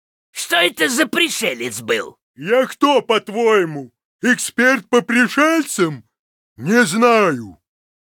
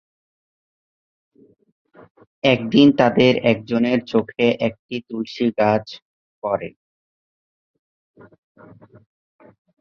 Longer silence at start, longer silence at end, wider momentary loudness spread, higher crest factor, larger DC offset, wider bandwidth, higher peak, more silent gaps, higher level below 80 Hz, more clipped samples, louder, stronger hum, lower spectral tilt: second, 0.35 s vs 2.45 s; second, 0.5 s vs 3.1 s; about the same, 14 LU vs 16 LU; about the same, 16 dB vs 20 dB; neither; first, 19 kHz vs 6.6 kHz; about the same, -2 dBFS vs -2 dBFS; first, 2.22-2.34 s, 4.05-4.19 s, 6.19-6.56 s vs 4.79-4.89 s, 6.02-6.42 s; second, -66 dBFS vs -60 dBFS; neither; first, -16 LUFS vs -19 LUFS; neither; second, -3 dB/octave vs -7 dB/octave